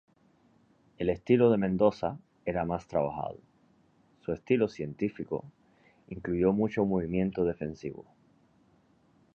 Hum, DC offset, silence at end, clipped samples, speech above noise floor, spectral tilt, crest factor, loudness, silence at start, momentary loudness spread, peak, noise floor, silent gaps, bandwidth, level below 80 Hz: none; under 0.1%; 1.35 s; under 0.1%; 36 dB; -9 dB/octave; 22 dB; -30 LUFS; 1 s; 15 LU; -10 dBFS; -65 dBFS; none; 7 kHz; -56 dBFS